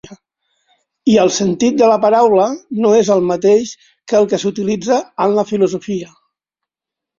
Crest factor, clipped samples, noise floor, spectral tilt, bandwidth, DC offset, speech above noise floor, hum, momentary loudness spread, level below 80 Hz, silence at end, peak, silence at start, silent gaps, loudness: 14 dB; under 0.1%; -85 dBFS; -5 dB/octave; 7.6 kHz; under 0.1%; 71 dB; none; 8 LU; -58 dBFS; 1.15 s; -2 dBFS; 0.05 s; none; -14 LUFS